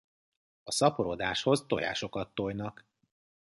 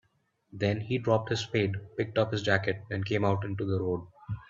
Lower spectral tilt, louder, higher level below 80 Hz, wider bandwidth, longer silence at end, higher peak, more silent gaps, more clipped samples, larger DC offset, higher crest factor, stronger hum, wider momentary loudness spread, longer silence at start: second, -4 dB/octave vs -6.5 dB/octave; about the same, -31 LUFS vs -30 LUFS; about the same, -62 dBFS vs -62 dBFS; first, 12 kHz vs 7.6 kHz; first, 0.9 s vs 0.05 s; about the same, -10 dBFS vs -8 dBFS; neither; neither; neither; about the same, 22 dB vs 22 dB; neither; first, 11 LU vs 6 LU; about the same, 0.65 s vs 0.55 s